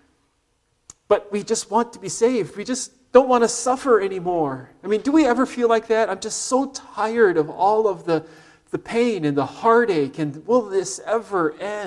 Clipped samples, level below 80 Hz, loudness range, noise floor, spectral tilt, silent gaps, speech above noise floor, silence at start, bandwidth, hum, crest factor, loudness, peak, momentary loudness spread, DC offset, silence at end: under 0.1%; -60 dBFS; 2 LU; -67 dBFS; -4.5 dB/octave; none; 47 dB; 1.1 s; 12 kHz; none; 20 dB; -21 LUFS; 0 dBFS; 9 LU; under 0.1%; 0 s